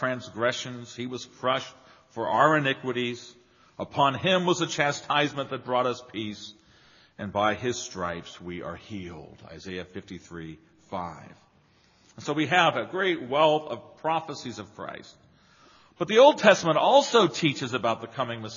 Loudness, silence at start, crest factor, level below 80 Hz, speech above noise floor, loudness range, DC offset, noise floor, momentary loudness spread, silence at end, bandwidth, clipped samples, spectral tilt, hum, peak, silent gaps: -25 LUFS; 0 s; 26 dB; -66 dBFS; 36 dB; 15 LU; under 0.1%; -62 dBFS; 20 LU; 0 s; 7.4 kHz; under 0.1%; -3 dB/octave; none; -2 dBFS; none